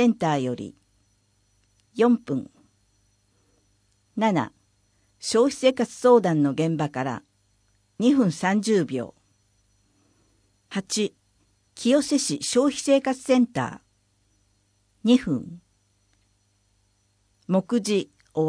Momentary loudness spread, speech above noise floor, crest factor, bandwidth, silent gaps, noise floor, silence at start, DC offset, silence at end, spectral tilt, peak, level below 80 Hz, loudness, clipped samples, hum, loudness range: 13 LU; 45 dB; 20 dB; 10.5 kHz; none; -67 dBFS; 0 s; under 0.1%; 0 s; -5 dB/octave; -6 dBFS; -66 dBFS; -23 LUFS; under 0.1%; 50 Hz at -60 dBFS; 7 LU